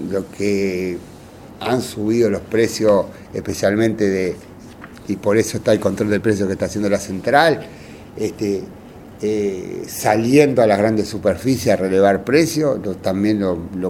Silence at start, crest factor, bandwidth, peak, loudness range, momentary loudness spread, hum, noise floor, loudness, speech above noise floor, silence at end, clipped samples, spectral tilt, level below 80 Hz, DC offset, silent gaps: 0 s; 18 dB; 17.5 kHz; 0 dBFS; 4 LU; 13 LU; none; -38 dBFS; -18 LUFS; 20 dB; 0 s; under 0.1%; -5.5 dB/octave; -48 dBFS; under 0.1%; none